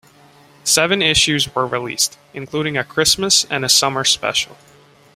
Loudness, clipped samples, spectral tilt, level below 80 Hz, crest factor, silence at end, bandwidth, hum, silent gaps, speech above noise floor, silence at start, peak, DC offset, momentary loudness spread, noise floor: -15 LUFS; under 0.1%; -1.5 dB/octave; -48 dBFS; 18 dB; 0.6 s; 16 kHz; none; none; 30 dB; 0.65 s; 0 dBFS; under 0.1%; 10 LU; -48 dBFS